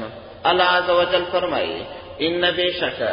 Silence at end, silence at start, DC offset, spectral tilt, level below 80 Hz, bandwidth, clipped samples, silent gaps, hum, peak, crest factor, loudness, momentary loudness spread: 0 s; 0 s; under 0.1%; -8.5 dB/octave; -50 dBFS; 5.4 kHz; under 0.1%; none; none; -4 dBFS; 18 dB; -20 LUFS; 12 LU